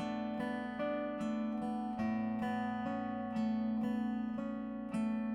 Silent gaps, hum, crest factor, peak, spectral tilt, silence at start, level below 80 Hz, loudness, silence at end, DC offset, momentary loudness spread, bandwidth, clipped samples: none; none; 10 dB; -26 dBFS; -7.5 dB/octave; 0 s; -66 dBFS; -38 LUFS; 0 s; under 0.1%; 4 LU; 10.5 kHz; under 0.1%